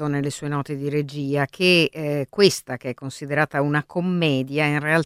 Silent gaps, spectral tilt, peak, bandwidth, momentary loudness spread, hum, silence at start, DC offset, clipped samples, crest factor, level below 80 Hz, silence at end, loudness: none; -5 dB/octave; -2 dBFS; 15.5 kHz; 10 LU; none; 0 s; under 0.1%; under 0.1%; 20 dB; -60 dBFS; 0 s; -22 LUFS